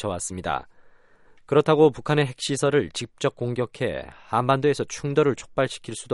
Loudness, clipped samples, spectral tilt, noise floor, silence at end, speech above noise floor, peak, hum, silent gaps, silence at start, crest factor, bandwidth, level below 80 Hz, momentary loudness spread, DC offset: -24 LUFS; under 0.1%; -5.5 dB/octave; -53 dBFS; 0 s; 30 dB; -4 dBFS; none; none; 0 s; 20 dB; 11.5 kHz; -54 dBFS; 10 LU; under 0.1%